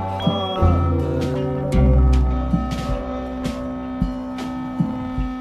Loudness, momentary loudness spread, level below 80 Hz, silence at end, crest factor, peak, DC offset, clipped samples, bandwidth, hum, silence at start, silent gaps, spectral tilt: -22 LUFS; 11 LU; -24 dBFS; 0 s; 14 dB; -6 dBFS; under 0.1%; under 0.1%; 9.4 kHz; none; 0 s; none; -8 dB/octave